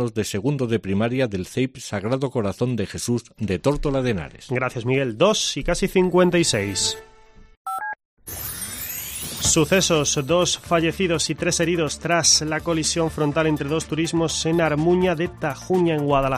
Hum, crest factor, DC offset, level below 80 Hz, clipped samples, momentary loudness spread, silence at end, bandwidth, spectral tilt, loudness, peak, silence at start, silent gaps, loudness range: none; 18 dB; under 0.1%; -42 dBFS; under 0.1%; 11 LU; 0 s; 15.5 kHz; -4 dB/octave; -21 LUFS; -4 dBFS; 0 s; 7.57-7.65 s, 8.05-8.17 s; 5 LU